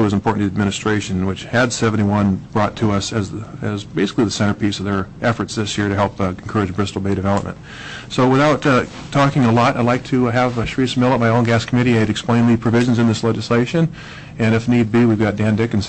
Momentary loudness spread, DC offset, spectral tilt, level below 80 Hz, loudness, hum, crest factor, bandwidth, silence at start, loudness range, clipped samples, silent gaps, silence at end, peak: 8 LU; under 0.1%; -6 dB/octave; -44 dBFS; -17 LUFS; none; 12 dB; 8.6 kHz; 0 s; 4 LU; under 0.1%; none; 0 s; -6 dBFS